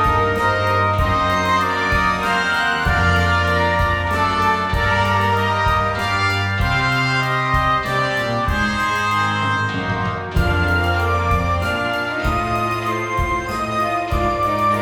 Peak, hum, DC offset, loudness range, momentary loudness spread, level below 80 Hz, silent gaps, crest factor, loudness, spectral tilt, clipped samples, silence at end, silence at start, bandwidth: -4 dBFS; none; under 0.1%; 3 LU; 4 LU; -30 dBFS; none; 14 dB; -18 LUFS; -5.5 dB/octave; under 0.1%; 0 s; 0 s; 17.5 kHz